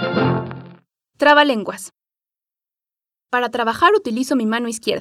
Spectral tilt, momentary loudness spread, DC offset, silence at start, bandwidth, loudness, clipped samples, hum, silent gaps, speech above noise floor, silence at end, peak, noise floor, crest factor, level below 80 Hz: -4.5 dB/octave; 19 LU; under 0.1%; 0 s; 15 kHz; -17 LUFS; under 0.1%; none; none; 73 dB; 0 s; 0 dBFS; -90 dBFS; 18 dB; -62 dBFS